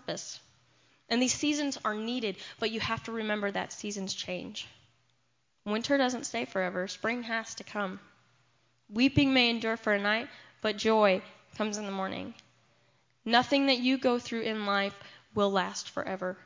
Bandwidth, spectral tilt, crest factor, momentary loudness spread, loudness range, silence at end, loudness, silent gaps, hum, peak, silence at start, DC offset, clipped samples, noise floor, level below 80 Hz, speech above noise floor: 7.6 kHz; -3.5 dB/octave; 24 dB; 13 LU; 6 LU; 0.1 s; -30 LUFS; none; none; -8 dBFS; 0.1 s; under 0.1%; under 0.1%; -75 dBFS; -62 dBFS; 45 dB